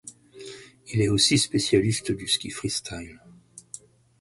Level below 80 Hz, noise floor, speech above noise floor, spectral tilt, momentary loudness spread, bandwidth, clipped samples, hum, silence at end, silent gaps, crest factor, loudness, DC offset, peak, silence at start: -52 dBFS; -47 dBFS; 23 dB; -4 dB/octave; 24 LU; 11.5 kHz; under 0.1%; none; 0.45 s; none; 20 dB; -23 LUFS; under 0.1%; -8 dBFS; 0.05 s